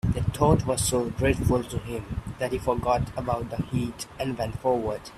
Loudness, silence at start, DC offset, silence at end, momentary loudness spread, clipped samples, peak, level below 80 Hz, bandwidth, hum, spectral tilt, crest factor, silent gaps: -27 LUFS; 0.05 s; under 0.1%; 0 s; 10 LU; under 0.1%; -6 dBFS; -40 dBFS; 15.5 kHz; none; -5.5 dB/octave; 20 dB; none